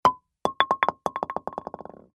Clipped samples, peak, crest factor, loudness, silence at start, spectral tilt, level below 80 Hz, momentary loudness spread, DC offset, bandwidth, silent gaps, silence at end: under 0.1%; 0 dBFS; 26 dB; -27 LUFS; 0.05 s; -4 dB/octave; -60 dBFS; 15 LU; under 0.1%; 12 kHz; none; 0.35 s